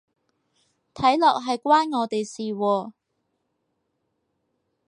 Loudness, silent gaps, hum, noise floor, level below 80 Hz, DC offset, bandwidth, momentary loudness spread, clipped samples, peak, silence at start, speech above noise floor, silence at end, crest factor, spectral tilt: -22 LUFS; none; none; -76 dBFS; -66 dBFS; under 0.1%; 11 kHz; 9 LU; under 0.1%; -6 dBFS; 0.95 s; 54 dB; 2 s; 20 dB; -4.5 dB/octave